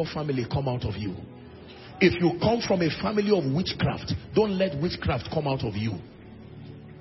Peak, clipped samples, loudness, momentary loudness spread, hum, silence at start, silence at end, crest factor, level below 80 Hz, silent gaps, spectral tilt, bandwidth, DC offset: -4 dBFS; under 0.1%; -26 LUFS; 21 LU; none; 0 s; 0 s; 22 dB; -48 dBFS; none; -7 dB/octave; 6 kHz; under 0.1%